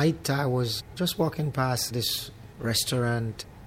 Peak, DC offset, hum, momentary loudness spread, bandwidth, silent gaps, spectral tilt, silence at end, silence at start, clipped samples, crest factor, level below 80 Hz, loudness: -12 dBFS; under 0.1%; none; 6 LU; 16.5 kHz; none; -4.5 dB/octave; 0 s; 0 s; under 0.1%; 16 dB; -52 dBFS; -27 LUFS